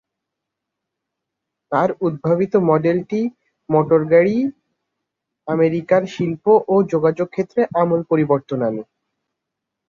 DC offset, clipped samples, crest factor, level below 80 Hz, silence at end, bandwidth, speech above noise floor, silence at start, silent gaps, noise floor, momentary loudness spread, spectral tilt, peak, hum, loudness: under 0.1%; under 0.1%; 18 dB; -62 dBFS; 1.05 s; 7.2 kHz; 64 dB; 1.7 s; none; -81 dBFS; 9 LU; -9 dB/octave; -2 dBFS; none; -18 LUFS